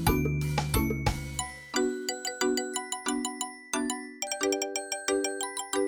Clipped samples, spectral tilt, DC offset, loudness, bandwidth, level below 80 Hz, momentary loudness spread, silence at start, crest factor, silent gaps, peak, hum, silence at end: under 0.1%; -4 dB/octave; under 0.1%; -30 LUFS; over 20 kHz; -42 dBFS; 6 LU; 0 s; 20 dB; none; -10 dBFS; none; 0 s